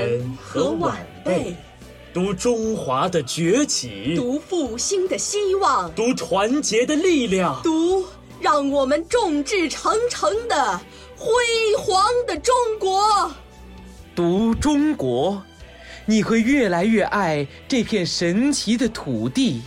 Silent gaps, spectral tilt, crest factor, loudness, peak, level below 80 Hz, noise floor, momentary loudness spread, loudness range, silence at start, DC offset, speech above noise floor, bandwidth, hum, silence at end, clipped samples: none; -4 dB/octave; 12 dB; -20 LUFS; -8 dBFS; -46 dBFS; -41 dBFS; 7 LU; 3 LU; 0 s; under 0.1%; 21 dB; 16 kHz; none; 0 s; under 0.1%